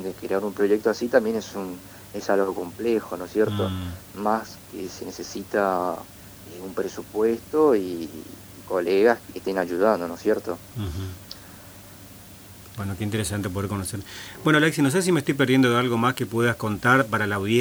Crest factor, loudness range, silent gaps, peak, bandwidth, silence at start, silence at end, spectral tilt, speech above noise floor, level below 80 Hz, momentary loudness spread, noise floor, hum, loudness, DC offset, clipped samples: 22 dB; 9 LU; none; -2 dBFS; over 20 kHz; 0 s; 0 s; -5.5 dB/octave; 21 dB; -54 dBFS; 20 LU; -44 dBFS; none; -24 LUFS; under 0.1%; under 0.1%